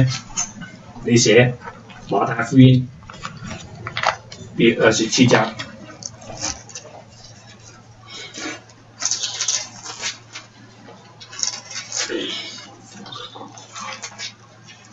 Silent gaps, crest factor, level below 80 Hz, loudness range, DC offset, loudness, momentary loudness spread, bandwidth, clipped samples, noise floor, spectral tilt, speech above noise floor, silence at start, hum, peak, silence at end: none; 22 dB; -52 dBFS; 11 LU; under 0.1%; -19 LUFS; 23 LU; 8.2 kHz; under 0.1%; -45 dBFS; -4.5 dB/octave; 29 dB; 0 s; none; 0 dBFS; 0.2 s